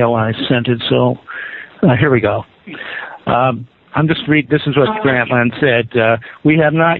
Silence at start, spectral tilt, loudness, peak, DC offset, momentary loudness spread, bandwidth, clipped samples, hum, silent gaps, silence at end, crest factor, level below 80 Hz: 0 s; -5 dB/octave; -14 LUFS; 0 dBFS; under 0.1%; 13 LU; 4.5 kHz; under 0.1%; none; none; 0 s; 14 dB; -46 dBFS